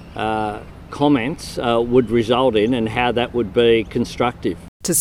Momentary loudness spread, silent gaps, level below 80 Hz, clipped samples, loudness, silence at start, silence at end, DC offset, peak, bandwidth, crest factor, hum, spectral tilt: 10 LU; 4.68-4.80 s; -42 dBFS; under 0.1%; -19 LUFS; 0 s; 0 s; under 0.1%; -2 dBFS; 18 kHz; 16 dB; none; -4.5 dB/octave